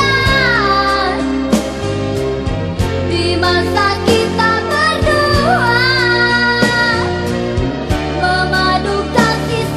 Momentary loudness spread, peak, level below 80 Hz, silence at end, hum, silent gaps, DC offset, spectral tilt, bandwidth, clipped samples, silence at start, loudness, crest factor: 7 LU; 0 dBFS; -28 dBFS; 0 s; none; none; under 0.1%; -5 dB/octave; 14 kHz; under 0.1%; 0 s; -13 LUFS; 14 dB